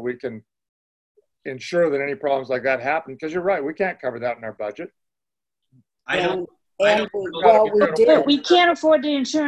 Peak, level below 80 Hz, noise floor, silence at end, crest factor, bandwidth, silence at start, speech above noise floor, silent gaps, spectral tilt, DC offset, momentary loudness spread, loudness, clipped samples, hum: -2 dBFS; -62 dBFS; under -90 dBFS; 0 s; 20 dB; 11 kHz; 0 s; over 70 dB; 0.69-1.15 s; -4.5 dB/octave; under 0.1%; 17 LU; -20 LUFS; under 0.1%; none